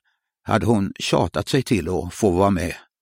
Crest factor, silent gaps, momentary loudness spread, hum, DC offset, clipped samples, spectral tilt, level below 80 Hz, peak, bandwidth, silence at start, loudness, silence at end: 18 dB; none; 7 LU; none; under 0.1%; under 0.1%; -6 dB/octave; -44 dBFS; -4 dBFS; 16 kHz; 0.45 s; -21 LUFS; 0.25 s